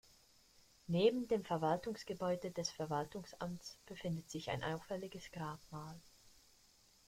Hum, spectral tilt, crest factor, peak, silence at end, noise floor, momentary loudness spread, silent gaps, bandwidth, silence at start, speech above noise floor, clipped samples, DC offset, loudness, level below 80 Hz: none; -5.5 dB/octave; 22 dB; -20 dBFS; 0.8 s; -69 dBFS; 16 LU; none; 16.5 kHz; 0.9 s; 29 dB; under 0.1%; under 0.1%; -41 LUFS; -70 dBFS